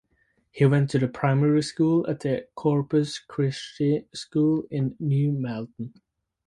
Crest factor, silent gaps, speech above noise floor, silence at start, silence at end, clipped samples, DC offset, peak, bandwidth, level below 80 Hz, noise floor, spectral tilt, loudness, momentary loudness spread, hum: 18 dB; none; 45 dB; 0.55 s; 0.6 s; under 0.1%; under 0.1%; -8 dBFS; 11 kHz; -62 dBFS; -69 dBFS; -7.5 dB/octave; -25 LUFS; 9 LU; none